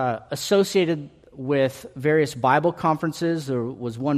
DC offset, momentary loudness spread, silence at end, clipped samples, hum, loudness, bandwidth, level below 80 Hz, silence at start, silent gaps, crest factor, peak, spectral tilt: under 0.1%; 9 LU; 0 s; under 0.1%; none; -23 LUFS; 14.5 kHz; -60 dBFS; 0 s; none; 18 dB; -4 dBFS; -5.5 dB/octave